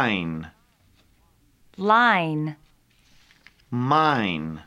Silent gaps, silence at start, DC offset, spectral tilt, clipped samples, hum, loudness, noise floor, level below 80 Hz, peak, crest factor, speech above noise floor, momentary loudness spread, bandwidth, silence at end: none; 0 s; under 0.1%; -6.5 dB/octave; under 0.1%; none; -22 LUFS; -61 dBFS; -58 dBFS; -6 dBFS; 20 dB; 39 dB; 15 LU; 12.5 kHz; 0.05 s